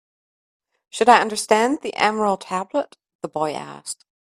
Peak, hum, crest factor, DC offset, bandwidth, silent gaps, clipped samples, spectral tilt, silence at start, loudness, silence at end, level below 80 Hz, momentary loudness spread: 0 dBFS; none; 22 dB; under 0.1%; 14 kHz; 3.15-3.19 s; under 0.1%; -3 dB/octave; 0.95 s; -20 LUFS; 0.4 s; -68 dBFS; 19 LU